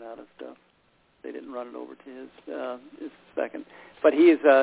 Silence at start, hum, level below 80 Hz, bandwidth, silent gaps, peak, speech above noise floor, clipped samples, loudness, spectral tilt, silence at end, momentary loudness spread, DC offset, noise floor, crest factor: 0 s; none; -72 dBFS; 4 kHz; none; -6 dBFS; 40 dB; under 0.1%; -24 LUFS; -8 dB/octave; 0 s; 26 LU; under 0.1%; -65 dBFS; 20 dB